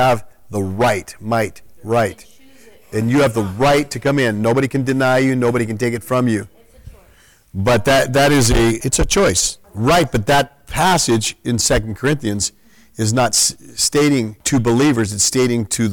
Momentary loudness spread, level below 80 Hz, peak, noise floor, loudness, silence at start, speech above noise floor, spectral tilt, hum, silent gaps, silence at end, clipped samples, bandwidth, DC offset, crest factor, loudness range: 8 LU; -34 dBFS; -4 dBFS; -50 dBFS; -16 LUFS; 0 s; 34 dB; -4 dB/octave; none; none; 0 s; under 0.1%; 19 kHz; under 0.1%; 14 dB; 4 LU